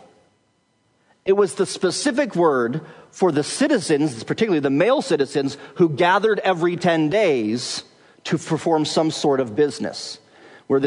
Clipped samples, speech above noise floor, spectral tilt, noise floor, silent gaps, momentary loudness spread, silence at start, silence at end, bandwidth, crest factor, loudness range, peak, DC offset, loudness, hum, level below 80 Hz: under 0.1%; 45 dB; -5 dB/octave; -65 dBFS; none; 10 LU; 1.25 s; 0 s; 11 kHz; 16 dB; 3 LU; -4 dBFS; under 0.1%; -20 LUFS; none; -70 dBFS